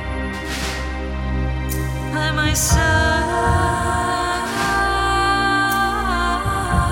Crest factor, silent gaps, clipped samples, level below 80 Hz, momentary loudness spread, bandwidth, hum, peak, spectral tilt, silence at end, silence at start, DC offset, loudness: 16 dB; none; under 0.1%; -26 dBFS; 8 LU; 17 kHz; none; -4 dBFS; -4 dB/octave; 0 s; 0 s; under 0.1%; -19 LUFS